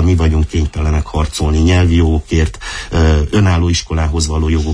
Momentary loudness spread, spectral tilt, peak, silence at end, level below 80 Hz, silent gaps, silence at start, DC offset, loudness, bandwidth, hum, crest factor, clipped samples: 6 LU; -6 dB/octave; -2 dBFS; 0 s; -18 dBFS; none; 0 s; under 0.1%; -14 LUFS; 10.5 kHz; none; 12 dB; under 0.1%